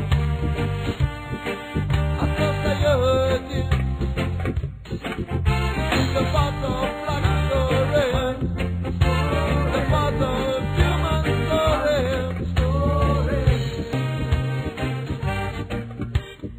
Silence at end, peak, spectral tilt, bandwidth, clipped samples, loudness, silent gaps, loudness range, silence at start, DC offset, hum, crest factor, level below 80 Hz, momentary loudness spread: 0 s; -6 dBFS; -6.5 dB/octave; 15.5 kHz; under 0.1%; -23 LUFS; none; 2 LU; 0 s; under 0.1%; none; 16 dB; -28 dBFS; 7 LU